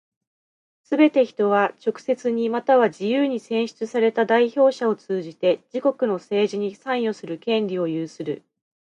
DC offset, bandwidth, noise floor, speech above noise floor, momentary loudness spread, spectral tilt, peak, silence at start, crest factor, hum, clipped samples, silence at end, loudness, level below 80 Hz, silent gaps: under 0.1%; 9.4 kHz; under -90 dBFS; over 69 dB; 10 LU; -6 dB/octave; -4 dBFS; 0.9 s; 18 dB; none; under 0.1%; 0.65 s; -22 LUFS; -76 dBFS; none